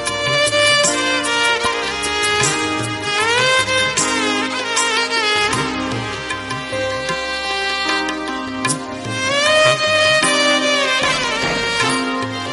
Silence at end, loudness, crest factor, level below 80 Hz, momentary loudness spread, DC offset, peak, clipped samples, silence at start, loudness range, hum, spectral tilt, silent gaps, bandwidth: 0 s; -16 LUFS; 18 dB; -46 dBFS; 9 LU; under 0.1%; 0 dBFS; under 0.1%; 0 s; 5 LU; none; -2 dB/octave; none; 11.5 kHz